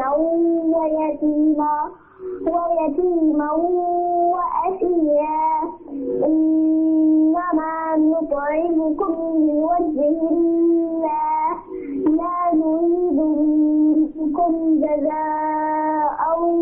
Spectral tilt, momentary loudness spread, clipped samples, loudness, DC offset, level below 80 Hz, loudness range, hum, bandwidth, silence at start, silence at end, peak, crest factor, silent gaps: -12 dB/octave; 5 LU; under 0.1%; -19 LUFS; under 0.1%; -50 dBFS; 2 LU; none; 2.8 kHz; 0 s; 0 s; -10 dBFS; 8 dB; none